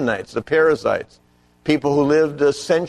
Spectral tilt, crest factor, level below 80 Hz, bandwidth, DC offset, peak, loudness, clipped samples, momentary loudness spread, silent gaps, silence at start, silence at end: -5.5 dB/octave; 16 dB; -52 dBFS; 11.5 kHz; under 0.1%; -4 dBFS; -19 LUFS; under 0.1%; 9 LU; none; 0 s; 0 s